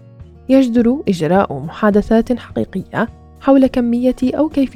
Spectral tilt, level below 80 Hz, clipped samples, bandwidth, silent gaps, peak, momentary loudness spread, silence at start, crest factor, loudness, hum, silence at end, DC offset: -7.5 dB/octave; -38 dBFS; under 0.1%; 10 kHz; none; 0 dBFS; 10 LU; 0.2 s; 14 dB; -15 LUFS; none; 0.05 s; under 0.1%